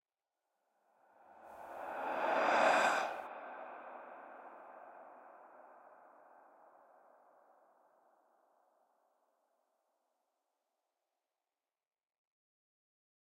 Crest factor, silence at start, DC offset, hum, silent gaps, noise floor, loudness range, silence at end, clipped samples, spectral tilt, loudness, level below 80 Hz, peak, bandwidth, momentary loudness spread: 26 dB; 1.4 s; under 0.1%; none; none; under -90 dBFS; 22 LU; 7.5 s; under 0.1%; -2 dB/octave; -34 LUFS; under -90 dBFS; -18 dBFS; 16 kHz; 28 LU